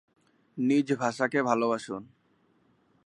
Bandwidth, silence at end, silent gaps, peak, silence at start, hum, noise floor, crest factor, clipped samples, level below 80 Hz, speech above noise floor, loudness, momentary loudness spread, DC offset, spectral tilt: 11 kHz; 1 s; none; -8 dBFS; 0.55 s; none; -68 dBFS; 22 dB; under 0.1%; -78 dBFS; 41 dB; -28 LUFS; 14 LU; under 0.1%; -5.5 dB/octave